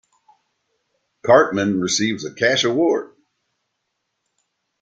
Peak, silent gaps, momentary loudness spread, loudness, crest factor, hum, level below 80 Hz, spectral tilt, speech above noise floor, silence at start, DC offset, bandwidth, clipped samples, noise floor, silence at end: -2 dBFS; none; 9 LU; -18 LUFS; 20 dB; none; -62 dBFS; -3.5 dB/octave; 58 dB; 1.25 s; under 0.1%; 9.4 kHz; under 0.1%; -75 dBFS; 1.75 s